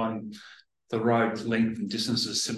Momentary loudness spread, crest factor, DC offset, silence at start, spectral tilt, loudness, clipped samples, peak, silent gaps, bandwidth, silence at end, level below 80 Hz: 13 LU; 18 dB; under 0.1%; 0 s; -4 dB/octave; -27 LUFS; under 0.1%; -12 dBFS; none; 12.5 kHz; 0 s; -64 dBFS